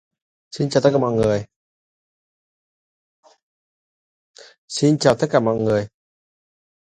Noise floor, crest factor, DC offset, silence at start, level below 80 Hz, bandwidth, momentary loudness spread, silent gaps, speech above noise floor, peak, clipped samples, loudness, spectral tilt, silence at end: under -90 dBFS; 22 dB; under 0.1%; 0.55 s; -54 dBFS; 11 kHz; 11 LU; 1.56-3.23 s, 3.43-4.34 s, 4.58-4.68 s; over 72 dB; 0 dBFS; under 0.1%; -19 LUFS; -6 dB/octave; 0.95 s